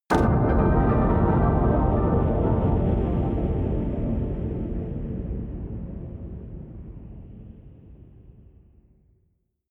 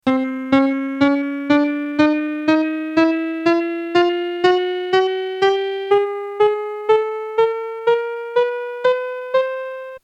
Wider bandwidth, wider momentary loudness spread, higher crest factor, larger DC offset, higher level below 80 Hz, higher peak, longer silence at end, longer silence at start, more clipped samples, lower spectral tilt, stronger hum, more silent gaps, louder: about the same, 9.2 kHz vs 8.4 kHz; first, 20 LU vs 4 LU; about the same, 18 dB vs 16 dB; neither; first, -30 dBFS vs -60 dBFS; second, -8 dBFS vs -2 dBFS; first, 1.4 s vs 0.05 s; about the same, 0.1 s vs 0.05 s; neither; first, -9.5 dB/octave vs -5.5 dB/octave; neither; neither; second, -24 LUFS vs -19 LUFS